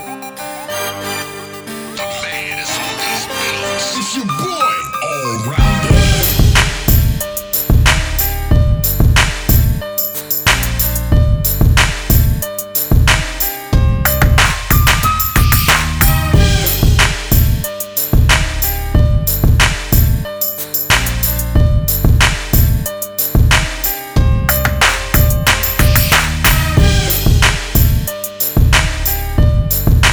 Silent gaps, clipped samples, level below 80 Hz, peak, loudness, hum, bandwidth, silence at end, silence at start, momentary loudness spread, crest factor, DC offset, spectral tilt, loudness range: none; under 0.1%; -16 dBFS; 0 dBFS; -13 LUFS; none; over 20 kHz; 0 s; 0 s; 8 LU; 12 dB; under 0.1%; -4 dB/octave; 5 LU